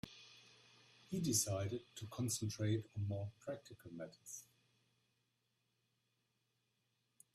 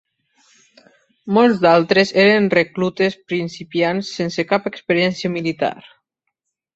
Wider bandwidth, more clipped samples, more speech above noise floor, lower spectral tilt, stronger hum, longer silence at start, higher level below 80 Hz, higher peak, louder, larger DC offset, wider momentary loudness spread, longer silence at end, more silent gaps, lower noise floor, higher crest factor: first, 15 kHz vs 8 kHz; neither; second, 42 dB vs 59 dB; second, -4.5 dB/octave vs -6 dB/octave; neither; second, 0.05 s vs 1.25 s; second, -76 dBFS vs -60 dBFS; second, -22 dBFS vs -2 dBFS; second, -42 LUFS vs -17 LUFS; neither; first, 19 LU vs 11 LU; first, 2.9 s vs 0.95 s; neither; first, -84 dBFS vs -76 dBFS; first, 24 dB vs 18 dB